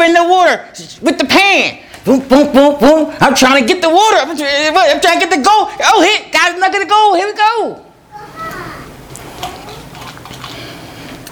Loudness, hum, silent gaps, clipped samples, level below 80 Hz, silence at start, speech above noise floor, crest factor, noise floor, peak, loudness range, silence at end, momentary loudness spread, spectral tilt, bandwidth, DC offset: -10 LUFS; none; none; 0.3%; -44 dBFS; 0 s; 24 dB; 12 dB; -34 dBFS; 0 dBFS; 14 LU; 0 s; 22 LU; -3 dB/octave; over 20 kHz; under 0.1%